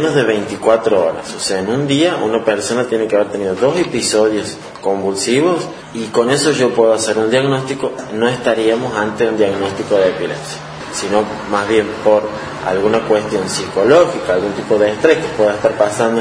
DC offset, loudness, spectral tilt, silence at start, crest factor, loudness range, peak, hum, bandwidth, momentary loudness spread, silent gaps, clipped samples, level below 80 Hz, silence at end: under 0.1%; -15 LUFS; -4.5 dB/octave; 0 s; 14 dB; 2 LU; 0 dBFS; none; 10.5 kHz; 8 LU; none; under 0.1%; -50 dBFS; 0 s